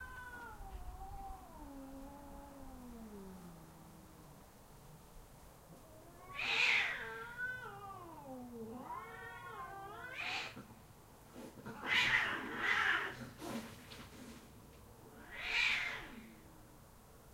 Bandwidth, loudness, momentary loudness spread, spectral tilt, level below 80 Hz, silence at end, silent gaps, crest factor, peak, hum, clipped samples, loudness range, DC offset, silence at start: 16 kHz; -38 LUFS; 26 LU; -2.5 dB/octave; -60 dBFS; 0 s; none; 24 dB; -20 dBFS; none; under 0.1%; 18 LU; under 0.1%; 0 s